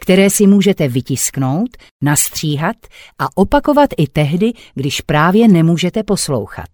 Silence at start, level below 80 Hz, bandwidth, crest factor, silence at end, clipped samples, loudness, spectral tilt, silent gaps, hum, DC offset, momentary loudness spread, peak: 0 s; -38 dBFS; over 20 kHz; 14 dB; 0.05 s; under 0.1%; -14 LUFS; -5 dB/octave; 1.91-2.00 s; none; under 0.1%; 11 LU; 0 dBFS